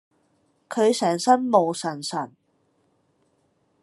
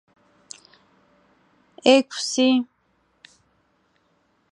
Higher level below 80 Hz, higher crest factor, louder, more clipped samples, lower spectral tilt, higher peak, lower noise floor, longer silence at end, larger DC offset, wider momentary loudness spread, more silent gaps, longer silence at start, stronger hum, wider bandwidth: about the same, -80 dBFS vs -76 dBFS; about the same, 22 dB vs 24 dB; about the same, -22 LUFS vs -20 LUFS; neither; first, -4.5 dB/octave vs -2 dB/octave; about the same, -4 dBFS vs -2 dBFS; about the same, -68 dBFS vs -66 dBFS; second, 1.55 s vs 1.85 s; neither; second, 13 LU vs 26 LU; neither; second, 0.7 s vs 1.85 s; neither; about the same, 12.5 kHz vs 11.5 kHz